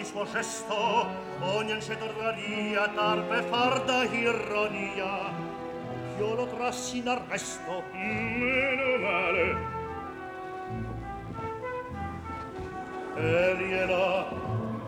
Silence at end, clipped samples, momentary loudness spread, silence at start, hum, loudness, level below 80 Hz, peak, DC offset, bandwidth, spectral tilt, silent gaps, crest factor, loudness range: 0 s; under 0.1%; 12 LU; 0 s; none; -30 LUFS; -54 dBFS; -14 dBFS; under 0.1%; 17 kHz; -4.5 dB/octave; none; 16 dB; 5 LU